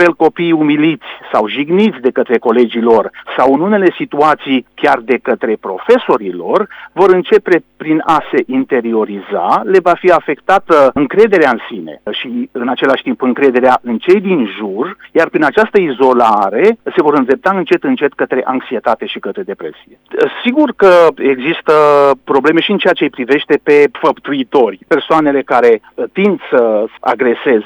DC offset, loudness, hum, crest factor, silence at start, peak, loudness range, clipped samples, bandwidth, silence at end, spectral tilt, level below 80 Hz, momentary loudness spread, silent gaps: under 0.1%; -12 LUFS; none; 12 dB; 0 s; 0 dBFS; 3 LU; 0.3%; 9.8 kHz; 0 s; -6.5 dB/octave; -54 dBFS; 9 LU; none